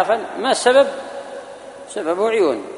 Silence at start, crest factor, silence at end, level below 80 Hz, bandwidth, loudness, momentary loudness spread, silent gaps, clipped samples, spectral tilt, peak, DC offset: 0 s; 18 dB; 0 s; -66 dBFS; 11 kHz; -17 LUFS; 20 LU; none; under 0.1%; -2.5 dB/octave; -2 dBFS; under 0.1%